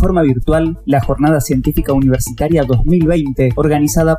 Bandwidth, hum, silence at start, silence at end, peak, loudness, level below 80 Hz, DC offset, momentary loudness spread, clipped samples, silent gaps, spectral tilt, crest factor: 16 kHz; none; 0 s; 0 s; -2 dBFS; -14 LUFS; -22 dBFS; under 0.1%; 3 LU; under 0.1%; none; -7 dB/octave; 12 dB